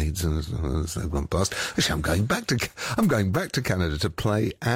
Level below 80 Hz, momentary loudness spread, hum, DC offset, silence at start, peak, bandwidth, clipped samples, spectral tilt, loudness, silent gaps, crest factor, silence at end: -36 dBFS; 5 LU; none; under 0.1%; 0 s; -12 dBFS; 16 kHz; under 0.1%; -5 dB/octave; -25 LUFS; none; 14 dB; 0 s